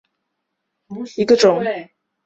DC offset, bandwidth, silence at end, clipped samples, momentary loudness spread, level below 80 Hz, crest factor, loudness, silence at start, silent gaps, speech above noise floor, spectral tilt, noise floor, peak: under 0.1%; 8 kHz; 0.4 s; under 0.1%; 19 LU; -62 dBFS; 18 dB; -16 LUFS; 0.9 s; none; 59 dB; -4.5 dB/octave; -76 dBFS; -2 dBFS